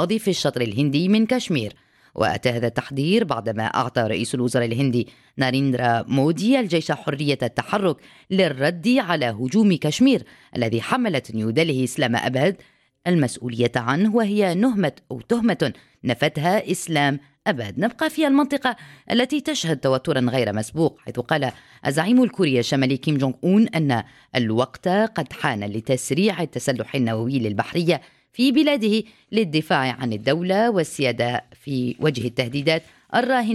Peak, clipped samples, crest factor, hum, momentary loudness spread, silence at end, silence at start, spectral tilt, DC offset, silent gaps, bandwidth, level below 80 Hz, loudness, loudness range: -4 dBFS; under 0.1%; 16 dB; none; 7 LU; 0 s; 0 s; -5.5 dB/octave; under 0.1%; none; 14.5 kHz; -60 dBFS; -22 LUFS; 2 LU